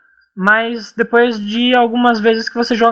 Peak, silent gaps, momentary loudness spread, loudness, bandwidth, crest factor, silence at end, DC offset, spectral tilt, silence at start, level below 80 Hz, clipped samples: 0 dBFS; none; 5 LU; -14 LUFS; 7.4 kHz; 14 dB; 0 s; under 0.1%; -5 dB/octave; 0.35 s; -58 dBFS; under 0.1%